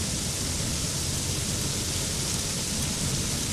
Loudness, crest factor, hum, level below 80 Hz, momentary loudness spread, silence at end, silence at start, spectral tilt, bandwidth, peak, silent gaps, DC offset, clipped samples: -27 LUFS; 18 dB; none; -40 dBFS; 1 LU; 0 s; 0 s; -2.5 dB/octave; 15 kHz; -12 dBFS; none; under 0.1%; under 0.1%